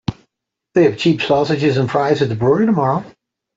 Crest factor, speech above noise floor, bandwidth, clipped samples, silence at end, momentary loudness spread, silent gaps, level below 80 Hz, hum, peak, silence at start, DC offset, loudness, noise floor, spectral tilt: 14 dB; 62 dB; 7.8 kHz; under 0.1%; 0.45 s; 6 LU; none; -52 dBFS; none; -2 dBFS; 0.1 s; under 0.1%; -16 LUFS; -76 dBFS; -7 dB/octave